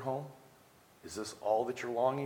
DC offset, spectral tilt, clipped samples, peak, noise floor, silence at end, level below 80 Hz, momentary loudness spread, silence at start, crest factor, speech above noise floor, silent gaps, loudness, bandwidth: under 0.1%; -5 dB/octave; under 0.1%; -18 dBFS; -62 dBFS; 0 s; -74 dBFS; 16 LU; 0 s; 20 dB; 28 dB; none; -36 LUFS; 18.5 kHz